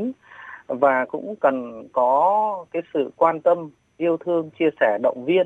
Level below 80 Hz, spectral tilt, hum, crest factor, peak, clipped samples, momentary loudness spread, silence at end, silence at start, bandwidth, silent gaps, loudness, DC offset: -72 dBFS; -7.5 dB/octave; none; 18 dB; -4 dBFS; under 0.1%; 13 LU; 0 s; 0 s; 7.4 kHz; none; -22 LUFS; under 0.1%